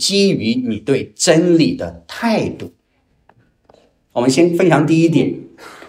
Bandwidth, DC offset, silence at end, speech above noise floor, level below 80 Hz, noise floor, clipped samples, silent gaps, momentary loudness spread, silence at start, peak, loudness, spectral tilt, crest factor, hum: 15.5 kHz; under 0.1%; 0 s; 46 dB; -52 dBFS; -61 dBFS; under 0.1%; none; 14 LU; 0 s; 0 dBFS; -15 LUFS; -5 dB/octave; 16 dB; none